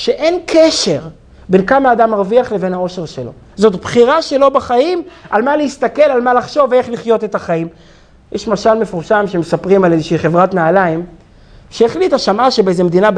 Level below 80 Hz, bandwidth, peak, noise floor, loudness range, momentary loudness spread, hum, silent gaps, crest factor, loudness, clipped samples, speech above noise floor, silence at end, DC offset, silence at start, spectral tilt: -44 dBFS; 10 kHz; 0 dBFS; -41 dBFS; 2 LU; 10 LU; none; none; 12 dB; -13 LUFS; 0.1%; 28 dB; 0 s; under 0.1%; 0 s; -5.5 dB/octave